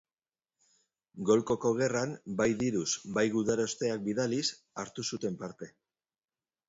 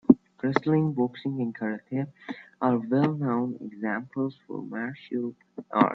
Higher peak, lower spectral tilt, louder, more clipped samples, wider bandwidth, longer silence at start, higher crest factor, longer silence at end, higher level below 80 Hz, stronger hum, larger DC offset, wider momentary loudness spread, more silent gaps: second, -12 dBFS vs -2 dBFS; second, -4.5 dB/octave vs -9.5 dB/octave; second, -31 LUFS vs -28 LUFS; neither; first, 8 kHz vs 6.2 kHz; first, 1.15 s vs 0.1 s; second, 20 dB vs 26 dB; first, 1 s vs 0 s; about the same, -66 dBFS vs -68 dBFS; neither; neither; about the same, 13 LU vs 12 LU; neither